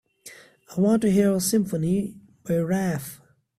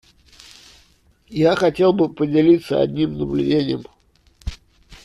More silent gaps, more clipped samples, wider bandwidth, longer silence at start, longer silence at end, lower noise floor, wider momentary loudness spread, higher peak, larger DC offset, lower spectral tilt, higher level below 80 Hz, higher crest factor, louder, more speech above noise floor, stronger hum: neither; neither; first, 15.5 kHz vs 12 kHz; second, 0.25 s vs 1.3 s; first, 0.45 s vs 0.1 s; second, -48 dBFS vs -56 dBFS; about the same, 20 LU vs 19 LU; second, -8 dBFS vs -4 dBFS; neither; second, -6 dB/octave vs -7.5 dB/octave; second, -58 dBFS vs -42 dBFS; about the same, 16 dB vs 16 dB; second, -23 LUFS vs -18 LUFS; second, 26 dB vs 39 dB; neither